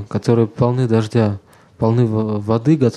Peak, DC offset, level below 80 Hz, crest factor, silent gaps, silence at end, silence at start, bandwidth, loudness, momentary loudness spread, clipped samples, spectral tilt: -2 dBFS; under 0.1%; -50 dBFS; 16 dB; none; 0 s; 0 s; 10 kHz; -17 LUFS; 5 LU; under 0.1%; -8.5 dB/octave